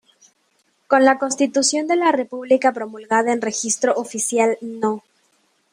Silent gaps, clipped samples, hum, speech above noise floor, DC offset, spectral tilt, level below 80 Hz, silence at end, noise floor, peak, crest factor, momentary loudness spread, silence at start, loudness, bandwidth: none; under 0.1%; none; 46 dB; under 0.1%; -2.5 dB/octave; -72 dBFS; 0.75 s; -65 dBFS; -2 dBFS; 18 dB; 8 LU; 0.9 s; -19 LUFS; 16 kHz